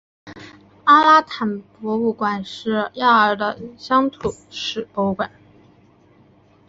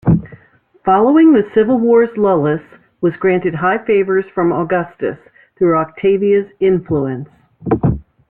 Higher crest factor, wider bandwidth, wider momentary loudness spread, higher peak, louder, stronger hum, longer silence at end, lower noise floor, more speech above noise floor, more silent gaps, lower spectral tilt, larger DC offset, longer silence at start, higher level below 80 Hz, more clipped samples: about the same, 18 dB vs 14 dB; first, 8 kHz vs 3.5 kHz; first, 15 LU vs 11 LU; about the same, -2 dBFS vs -2 dBFS; second, -19 LUFS vs -15 LUFS; neither; first, 1.4 s vs 0.3 s; about the same, -53 dBFS vs -50 dBFS; about the same, 34 dB vs 37 dB; neither; second, -5 dB/octave vs -11.5 dB/octave; neither; first, 0.25 s vs 0.05 s; second, -56 dBFS vs -42 dBFS; neither